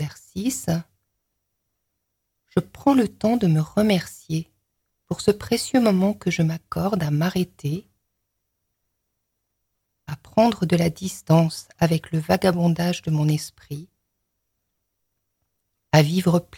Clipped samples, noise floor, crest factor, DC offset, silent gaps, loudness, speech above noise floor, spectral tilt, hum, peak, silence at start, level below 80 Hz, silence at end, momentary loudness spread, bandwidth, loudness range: under 0.1%; -77 dBFS; 20 dB; under 0.1%; none; -22 LUFS; 56 dB; -6.5 dB/octave; none; -2 dBFS; 0 s; -54 dBFS; 0 s; 10 LU; 17 kHz; 6 LU